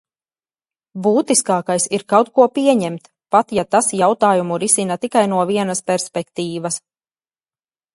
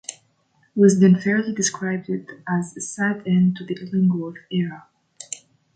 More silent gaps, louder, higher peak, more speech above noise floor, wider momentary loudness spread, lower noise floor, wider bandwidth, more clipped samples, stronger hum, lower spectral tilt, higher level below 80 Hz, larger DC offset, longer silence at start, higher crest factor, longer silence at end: neither; first, -17 LUFS vs -21 LUFS; first, 0 dBFS vs -4 dBFS; first, over 73 dB vs 43 dB; second, 10 LU vs 16 LU; first, under -90 dBFS vs -63 dBFS; first, 11.5 kHz vs 9.2 kHz; neither; neither; second, -4 dB/octave vs -6 dB/octave; about the same, -62 dBFS vs -64 dBFS; neither; first, 0.95 s vs 0.1 s; about the same, 18 dB vs 18 dB; first, 1.15 s vs 0.4 s